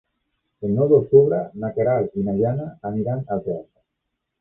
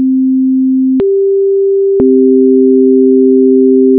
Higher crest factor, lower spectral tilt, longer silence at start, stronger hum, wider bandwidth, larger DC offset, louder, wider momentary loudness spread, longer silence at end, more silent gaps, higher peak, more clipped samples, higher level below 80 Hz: first, 20 dB vs 6 dB; about the same, -13 dB/octave vs -13 dB/octave; first, 0.6 s vs 0 s; neither; first, 2.4 kHz vs 1.5 kHz; neither; second, -21 LUFS vs -8 LUFS; first, 13 LU vs 3 LU; first, 0.75 s vs 0 s; neither; about the same, -2 dBFS vs 0 dBFS; neither; second, -54 dBFS vs -48 dBFS